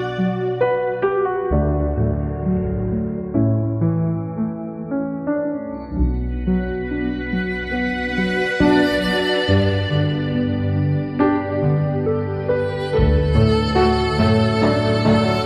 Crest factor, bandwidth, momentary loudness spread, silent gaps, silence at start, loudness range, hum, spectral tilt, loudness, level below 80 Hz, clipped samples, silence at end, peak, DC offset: 16 dB; 12 kHz; 7 LU; none; 0 s; 5 LU; none; -7.5 dB/octave; -20 LUFS; -30 dBFS; under 0.1%; 0 s; -2 dBFS; under 0.1%